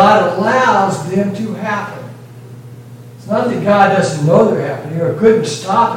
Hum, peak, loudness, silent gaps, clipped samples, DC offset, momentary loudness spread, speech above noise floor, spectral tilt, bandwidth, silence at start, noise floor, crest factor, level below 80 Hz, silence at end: none; 0 dBFS; -14 LUFS; none; under 0.1%; under 0.1%; 23 LU; 21 dB; -6 dB/octave; 16.5 kHz; 0 s; -34 dBFS; 14 dB; -54 dBFS; 0 s